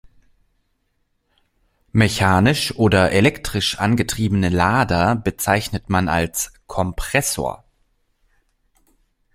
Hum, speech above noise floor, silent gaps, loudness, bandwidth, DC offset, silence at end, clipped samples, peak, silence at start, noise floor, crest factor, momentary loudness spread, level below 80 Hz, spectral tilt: none; 50 dB; none; -19 LUFS; 16.5 kHz; under 0.1%; 1.8 s; under 0.1%; 0 dBFS; 1.95 s; -68 dBFS; 20 dB; 9 LU; -40 dBFS; -5 dB/octave